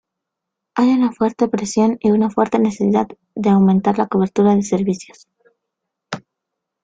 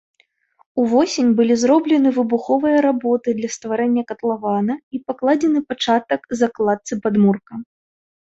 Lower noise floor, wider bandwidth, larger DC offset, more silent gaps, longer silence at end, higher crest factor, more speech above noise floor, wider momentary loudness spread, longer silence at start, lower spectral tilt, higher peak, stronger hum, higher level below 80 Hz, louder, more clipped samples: first, -81 dBFS vs -59 dBFS; first, 9.2 kHz vs 8 kHz; neither; second, none vs 4.83-4.91 s; about the same, 0.65 s vs 0.65 s; about the same, 16 dB vs 14 dB; first, 65 dB vs 41 dB; first, 12 LU vs 8 LU; about the same, 0.75 s vs 0.75 s; first, -7 dB/octave vs -5.5 dB/octave; about the same, -2 dBFS vs -4 dBFS; neither; first, -56 dBFS vs -62 dBFS; about the same, -17 LUFS vs -18 LUFS; neither